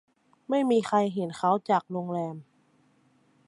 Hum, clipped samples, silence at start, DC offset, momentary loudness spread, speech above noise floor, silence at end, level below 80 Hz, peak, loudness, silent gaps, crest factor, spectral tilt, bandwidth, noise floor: none; under 0.1%; 0.5 s; under 0.1%; 9 LU; 39 dB; 1.05 s; -76 dBFS; -12 dBFS; -27 LUFS; none; 18 dB; -6.5 dB/octave; 11.5 kHz; -65 dBFS